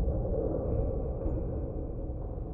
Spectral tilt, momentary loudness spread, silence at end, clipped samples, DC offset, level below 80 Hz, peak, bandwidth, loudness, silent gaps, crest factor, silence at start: -14.5 dB/octave; 7 LU; 0 s; under 0.1%; under 0.1%; -36 dBFS; -18 dBFS; 2.6 kHz; -34 LUFS; none; 14 dB; 0 s